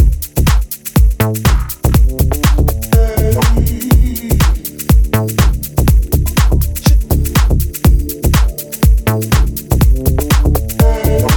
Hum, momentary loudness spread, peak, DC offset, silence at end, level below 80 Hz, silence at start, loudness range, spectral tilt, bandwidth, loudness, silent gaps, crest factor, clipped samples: none; 3 LU; 0 dBFS; under 0.1%; 0 s; -12 dBFS; 0 s; 0 LU; -5.5 dB/octave; 19.5 kHz; -13 LUFS; none; 10 dB; under 0.1%